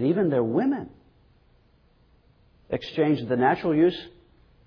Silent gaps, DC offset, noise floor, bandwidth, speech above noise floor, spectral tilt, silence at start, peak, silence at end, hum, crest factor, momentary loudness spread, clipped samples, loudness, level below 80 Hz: none; under 0.1%; -60 dBFS; 5.4 kHz; 37 dB; -9 dB/octave; 0 s; -10 dBFS; 0.55 s; none; 18 dB; 14 LU; under 0.1%; -24 LUFS; -60 dBFS